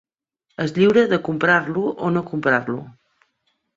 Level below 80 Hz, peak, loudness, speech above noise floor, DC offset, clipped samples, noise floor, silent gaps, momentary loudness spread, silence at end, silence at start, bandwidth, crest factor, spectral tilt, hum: -60 dBFS; -2 dBFS; -19 LUFS; 53 dB; under 0.1%; under 0.1%; -72 dBFS; none; 13 LU; 0.85 s; 0.6 s; 7.6 kHz; 20 dB; -7 dB/octave; none